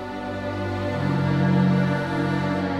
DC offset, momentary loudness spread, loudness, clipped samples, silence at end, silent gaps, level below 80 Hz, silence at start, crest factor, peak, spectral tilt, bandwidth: 0.2%; 9 LU; -23 LUFS; under 0.1%; 0 s; none; -50 dBFS; 0 s; 12 dB; -10 dBFS; -8 dB/octave; 9 kHz